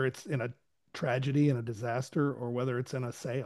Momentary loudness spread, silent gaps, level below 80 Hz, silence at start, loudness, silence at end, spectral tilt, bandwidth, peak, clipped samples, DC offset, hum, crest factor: 9 LU; none; -72 dBFS; 0 s; -33 LUFS; 0 s; -7 dB/octave; 12.5 kHz; -16 dBFS; under 0.1%; under 0.1%; none; 16 dB